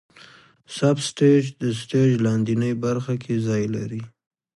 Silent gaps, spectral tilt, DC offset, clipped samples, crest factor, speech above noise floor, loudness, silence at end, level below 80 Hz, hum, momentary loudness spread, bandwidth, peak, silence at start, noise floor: none; -6.5 dB/octave; under 0.1%; under 0.1%; 16 dB; 28 dB; -22 LUFS; 0.5 s; -60 dBFS; none; 10 LU; 11.5 kHz; -6 dBFS; 0.7 s; -50 dBFS